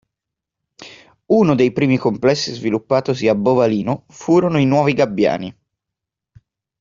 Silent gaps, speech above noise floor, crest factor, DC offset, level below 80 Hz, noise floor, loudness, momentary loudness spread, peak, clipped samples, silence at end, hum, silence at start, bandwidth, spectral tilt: none; 67 dB; 16 dB; under 0.1%; -56 dBFS; -83 dBFS; -17 LUFS; 7 LU; -2 dBFS; under 0.1%; 1.3 s; none; 0.8 s; 7.6 kHz; -6.5 dB/octave